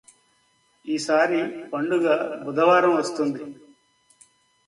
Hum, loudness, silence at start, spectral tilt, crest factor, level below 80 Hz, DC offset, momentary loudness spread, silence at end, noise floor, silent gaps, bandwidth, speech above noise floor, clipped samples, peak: none; -22 LUFS; 0.85 s; -4.5 dB/octave; 18 dB; -72 dBFS; under 0.1%; 13 LU; 1.15 s; -65 dBFS; none; 11.5 kHz; 43 dB; under 0.1%; -6 dBFS